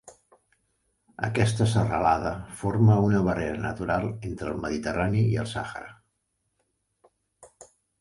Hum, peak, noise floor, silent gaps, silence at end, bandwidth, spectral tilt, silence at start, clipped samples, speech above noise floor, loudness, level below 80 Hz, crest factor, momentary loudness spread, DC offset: none; -8 dBFS; -77 dBFS; none; 0.35 s; 11.5 kHz; -7 dB/octave; 0.05 s; under 0.1%; 52 dB; -26 LUFS; -48 dBFS; 20 dB; 12 LU; under 0.1%